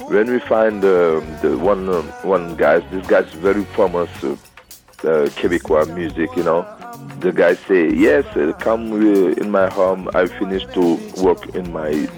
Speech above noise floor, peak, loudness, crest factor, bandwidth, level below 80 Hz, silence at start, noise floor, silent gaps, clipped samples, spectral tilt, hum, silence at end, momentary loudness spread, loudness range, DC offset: 27 dB; -4 dBFS; -17 LUFS; 14 dB; 19 kHz; -44 dBFS; 0 s; -43 dBFS; none; under 0.1%; -6.5 dB/octave; none; 0 s; 8 LU; 3 LU; under 0.1%